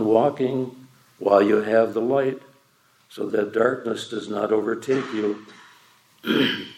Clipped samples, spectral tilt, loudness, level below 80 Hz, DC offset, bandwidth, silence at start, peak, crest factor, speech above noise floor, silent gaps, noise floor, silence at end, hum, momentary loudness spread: under 0.1%; -6 dB/octave; -23 LUFS; -78 dBFS; under 0.1%; 16 kHz; 0 s; -4 dBFS; 20 dB; 39 dB; none; -60 dBFS; 0.05 s; none; 11 LU